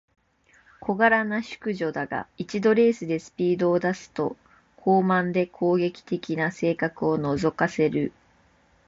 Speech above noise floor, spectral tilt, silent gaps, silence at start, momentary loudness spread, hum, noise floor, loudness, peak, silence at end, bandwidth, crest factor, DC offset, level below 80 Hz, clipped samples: 37 dB; -7 dB/octave; none; 0.8 s; 11 LU; none; -61 dBFS; -25 LUFS; -8 dBFS; 0.8 s; 7.8 kHz; 18 dB; under 0.1%; -60 dBFS; under 0.1%